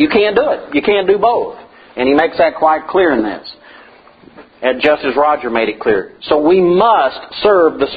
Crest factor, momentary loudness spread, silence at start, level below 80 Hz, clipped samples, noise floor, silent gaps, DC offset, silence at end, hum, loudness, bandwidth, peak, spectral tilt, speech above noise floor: 14 dB; 8 LU; 0 s; -48 dBFS; under 0.1%; -42 dBFS; none; under 0.1%; 0 s; none; -13 LUFS; 5 kHz; 0 dBFS; -8 dB/octave; 30 dB